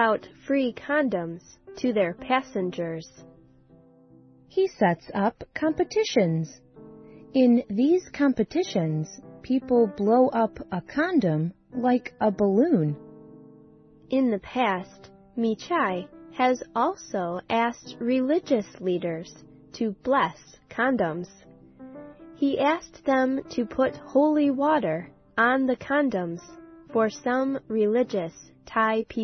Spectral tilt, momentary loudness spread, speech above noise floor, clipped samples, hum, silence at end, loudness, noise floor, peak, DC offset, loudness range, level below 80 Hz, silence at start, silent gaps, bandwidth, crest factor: -6.5 dB/octave; 12 LU; 30 dB; under 0.1%; none; 0 s; -25 LUFS; -55 dBFS; -8 dBFS; under 0.1%; 5 LU; -60 dBFS; 0 s; none; 6.4 kHz; 16 dB